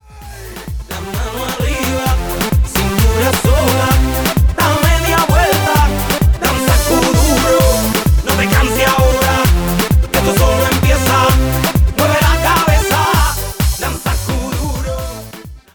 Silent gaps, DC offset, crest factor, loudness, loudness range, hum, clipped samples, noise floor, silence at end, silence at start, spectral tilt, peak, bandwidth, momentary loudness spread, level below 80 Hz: none; under 0.1%; 12 dB; -13 LUFS; 3 LU; none; under 0.1%; -32 dBFS; 0.15 s; 0.1 s; -4.5 dB/octave; -2 dBFS; over 20 kHz; 10 LU; -18 dBFS